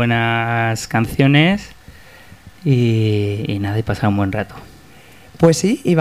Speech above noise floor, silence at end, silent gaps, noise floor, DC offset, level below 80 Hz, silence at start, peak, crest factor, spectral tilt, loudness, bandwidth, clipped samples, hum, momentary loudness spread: 28 dB; 0 s; none; -44 dBFS; 0.4%; -44 dBFS; 0 s; -2 dBFS; 16 dB; -6 dB/octave; -17 LUFS; 15.5 kHz; under 0.1%; none; 9 LU